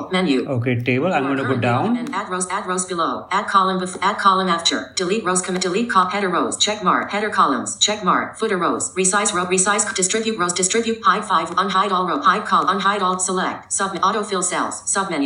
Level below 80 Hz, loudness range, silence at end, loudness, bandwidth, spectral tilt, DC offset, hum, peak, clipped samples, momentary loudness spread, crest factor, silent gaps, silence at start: -60 dBFS; 2 LU; 0 s; -19 LUFS; 11 kHz; -3 dB/octave; under 0.1%; none; -2 dBFS; under 0.1%; 5 LU; 18 dB; none; 0 s